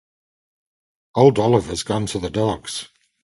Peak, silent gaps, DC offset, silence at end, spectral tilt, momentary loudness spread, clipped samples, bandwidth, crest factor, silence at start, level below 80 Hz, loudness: 0 dBFS; none; under 0.1%; 0.4 s; -6 dB/octave; 13 LU; under 0.1%; 11.5 kHz; 20 dB; 1.15 s; -46 dBFS; -20 LUFS